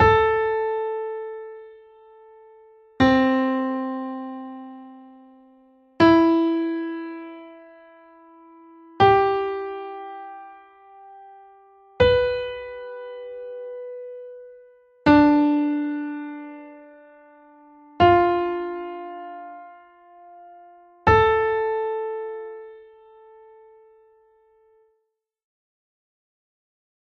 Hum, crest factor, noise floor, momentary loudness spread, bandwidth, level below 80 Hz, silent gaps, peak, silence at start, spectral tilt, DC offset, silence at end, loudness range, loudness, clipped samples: none; 20 dB; -76 dBFS; 23 LU; 6.8 kHz; -46 dBFS; none; -4 dBFS; 0 s; -7.5 dB/octave; under 0.1%; 4.2 s; 4 LU; -21 LUFS; under 0.1%